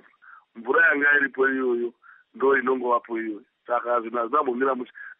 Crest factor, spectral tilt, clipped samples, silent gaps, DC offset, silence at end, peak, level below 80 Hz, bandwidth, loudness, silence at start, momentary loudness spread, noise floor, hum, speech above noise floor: 14 dB; -2 dB/octave; under 0.1%; none; under 0.1%; 0.05 s; -10 dBFS; -88 dBFS; 3.8 kHz; -23 LUFS; 0.3 s; 12 LU; -52 dBFS; none; 29 dB